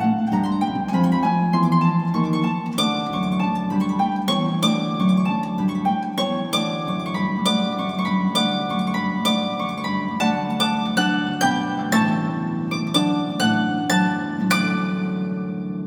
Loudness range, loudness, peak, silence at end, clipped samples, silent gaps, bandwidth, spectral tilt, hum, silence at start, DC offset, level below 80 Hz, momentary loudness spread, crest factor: 1 LU; -21 LUFS; -4 dBFS; 0 s; under 0.1%; none; 18 kHz; -5.5 dB/octave; none; 0 s; under 0.1%; -58 dBFS; 5 LU; 18 dB